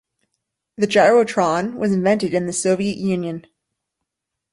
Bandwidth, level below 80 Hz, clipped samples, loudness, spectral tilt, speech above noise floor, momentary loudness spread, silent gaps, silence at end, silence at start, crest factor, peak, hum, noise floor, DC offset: 11.5 kHz; -60 dBFS; under 0.1%; -18 LUFS; -5 dB/octave; 63 dB; 10 LU; none; 1.15 s; 0.8 s; 18 dB; -2 dBFS; none; -81 dBFS; under 0.1%